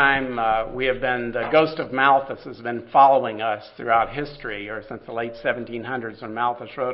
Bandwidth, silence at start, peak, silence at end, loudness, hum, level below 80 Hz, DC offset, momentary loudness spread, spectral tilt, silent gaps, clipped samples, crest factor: 5.8 kHz; 0 s; -2 dBFS; 0 s; -22 LUFS; none; -48 dBFS; under 0.1%; 15 LU; -9.5 dB/octave; none; under 0.1%; 20 dB